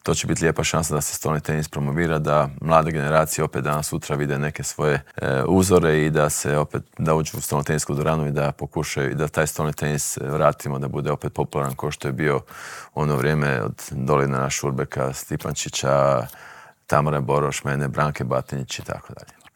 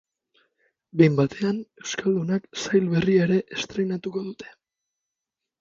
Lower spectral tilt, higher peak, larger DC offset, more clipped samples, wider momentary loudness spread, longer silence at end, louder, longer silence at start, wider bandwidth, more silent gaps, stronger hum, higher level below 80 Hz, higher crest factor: second, -5 dB/octave vs -6.5 dB/octave; first, 0 dBFS vs -4 dBFS; neither; neither; second, 8 LU vs 13 LU; second, 0.3 s vs 1.15 s; about the same, -22 LUFS vs -24 LUFS; second, 0.05 s vs 0.95 s; first, 19 kHz vs 7.6 kHz; neither; neither; first, -46 dBFS vs -60 dBFS; about the same, 22 dB vs 22 dB